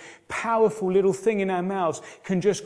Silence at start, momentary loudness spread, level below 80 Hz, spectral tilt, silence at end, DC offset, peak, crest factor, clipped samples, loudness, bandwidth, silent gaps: 0 s; 8 LU; -64 dBFS; -6 dB/octave; 0 s; under 0.1%; -10 dBFS; 16 dB; under 0.1%; -24 LUFS; 11 kHz; none